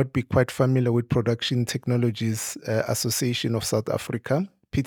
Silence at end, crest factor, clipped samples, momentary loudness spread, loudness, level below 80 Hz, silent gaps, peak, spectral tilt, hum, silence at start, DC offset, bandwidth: 0 s; 18 dB; under 0.1%; 5 LU; -25 LUFS; -52 dBFS; none; -6 dBFS; -5.5 dB/octave; none; 0 s; under 0.1%; 19.5 kHz